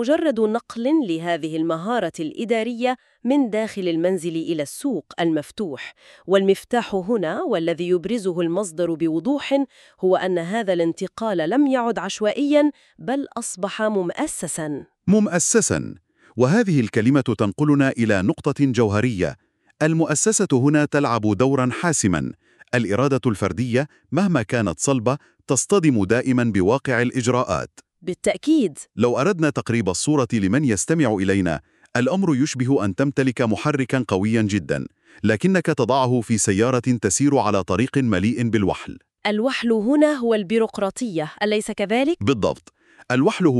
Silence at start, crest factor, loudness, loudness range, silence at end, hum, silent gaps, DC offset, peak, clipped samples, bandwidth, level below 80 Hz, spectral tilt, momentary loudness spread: 0 s; 18 dB; -21 LUFS; 3 LU; 0 s; none; none; under 0.1%; -4 dBFS; under 0.1%; 13 kHz; -54 dBFS; -5.5 dB/octave; 8 LU